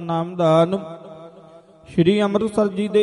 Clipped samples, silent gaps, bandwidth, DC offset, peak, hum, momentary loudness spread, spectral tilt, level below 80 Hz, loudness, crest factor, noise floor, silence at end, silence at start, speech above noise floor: under 0.1%; none; 11.5 kHz; under 0.1%; -4 dBFS; none; 19 LU; -7.5 dB/octave; -56 dBFS; -19 LUFS; 16 dB; -46 dBFS; 0 s; 0 s; 28 dB